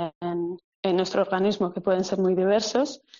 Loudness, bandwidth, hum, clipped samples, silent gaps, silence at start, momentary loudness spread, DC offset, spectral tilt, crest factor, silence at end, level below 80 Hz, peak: -25 LUFS; 7.6 kHz; none; under 0.1%; 0.15-0.21 s, 0.64-0.83 s; 0 s; 8 LU; under 0.1%; -5 dB/octave; 16 dB; 0.2 s; -66 dBFS; -10 dBFS